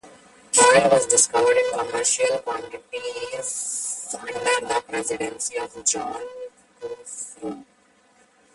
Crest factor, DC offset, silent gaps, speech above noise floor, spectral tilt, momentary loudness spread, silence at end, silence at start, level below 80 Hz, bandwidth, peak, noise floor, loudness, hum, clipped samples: 22 dB; under 0.1%; none; 35 dB; -1 dB/octave; 19 LU; 0.9 s; 0.05 s; -62 dBFS; 11.5 kHz; -2 dBFS; -59 dBFS; -21 LUFS; none; under 0.1%